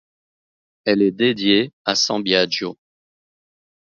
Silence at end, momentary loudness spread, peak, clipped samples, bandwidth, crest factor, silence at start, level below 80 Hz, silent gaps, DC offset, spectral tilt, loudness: 1.1 s; 8 LU; -2 dBFS; under 0.1%; 7.6 kHz; 20 dB; 0.85 s; -62 dBFS; 1.73-1.85 s; under 0.1%; -3.5 dB/octave; -18 LUFS